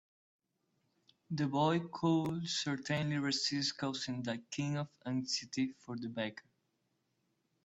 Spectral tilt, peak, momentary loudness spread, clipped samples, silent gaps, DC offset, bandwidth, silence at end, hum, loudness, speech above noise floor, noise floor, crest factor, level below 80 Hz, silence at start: -4.5 dB/octave; -20 dBFS; 8 LU; under 0.1%; none; under 0.1%; 8.4 kHz; 1.25 s; none; -36 LUFS; 45 dB; -81 dBFS; 18 dB; -74 dBFS; 1.3 s